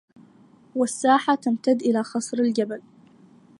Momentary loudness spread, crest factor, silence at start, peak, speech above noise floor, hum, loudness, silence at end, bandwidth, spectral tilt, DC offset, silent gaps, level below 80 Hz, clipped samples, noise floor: 10 LU; 18 dB; 0.75 s; -6 dBFS; 32 dB; none; -23 LUFS; 0.8 s; 11.5 kHz; -4.5 dB/octave; under 0.1%; none; -78 dBFS; under 0.1%; -54 dBFS